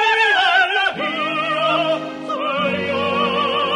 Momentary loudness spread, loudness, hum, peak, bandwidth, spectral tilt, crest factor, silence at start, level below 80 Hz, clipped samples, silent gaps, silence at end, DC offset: 8 LU; -18 LUFS; none; -4 dBFS; 12.5 kHz; -4 dB/octave; 14 dB; 0 s; -60 dBFS; under 0.1%; none; 0 s; under 0.1%